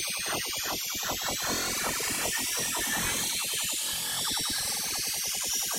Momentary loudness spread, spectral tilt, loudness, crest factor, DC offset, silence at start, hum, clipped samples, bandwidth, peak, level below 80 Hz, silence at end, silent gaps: 2 LU; 0 dB/octave; -28 LUFS; 14 dB; under 0.1%; 0 s; none; under 0.1%; 16 kHz; -16 dBFS; -54 dBFS; 0 s; none